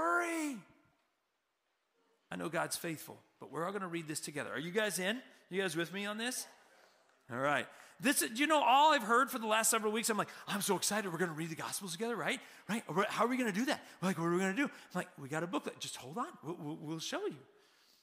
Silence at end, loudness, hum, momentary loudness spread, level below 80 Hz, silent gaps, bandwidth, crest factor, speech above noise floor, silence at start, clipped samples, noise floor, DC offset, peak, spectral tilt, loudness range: 0.6 s; -35 LUFS; none; 13 LU; -86 dBFS; none; 16 kHz; 20 dB; 47 dB; 0 s; under 0.1%; -83 dBFS; under 0.1%; -18 dBFS; -3 dB/octave; 11 LU